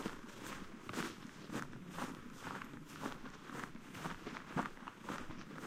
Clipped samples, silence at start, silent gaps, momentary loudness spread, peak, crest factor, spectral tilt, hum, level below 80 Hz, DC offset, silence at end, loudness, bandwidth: under 0.1%; 0 s; none; 7 LU; -22 dBFS; 24 dB; -4.5 dB/octave; none; -64 dBFS; under 0.1%; 0 s; -47 LUFS; 16 kHz